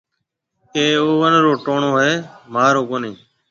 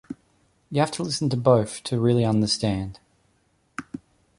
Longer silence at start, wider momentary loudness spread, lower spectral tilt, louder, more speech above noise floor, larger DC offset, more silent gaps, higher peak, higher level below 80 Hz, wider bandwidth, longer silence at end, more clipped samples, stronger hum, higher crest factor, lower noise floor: first, 0.75 s vs 0.1 s; second, 12 LU vs 21 LU; about the same, -5 dB/octave vs -6 dB/octave; first, -16 LUFS vs -23 LUFS; first, 60 dB vs 44 dB; neither; neither; first, 0 dBFS vs -4 dBFS; second, -64 dBFS vs -52 dBFS; second, 7.4 kHz vs 11.5 kHz; about the same, 0.35 s vs 0.4 s; neither; neither; about the same, 18 dB vs 20 dB; first, -76 dBFS vs -66 dBFS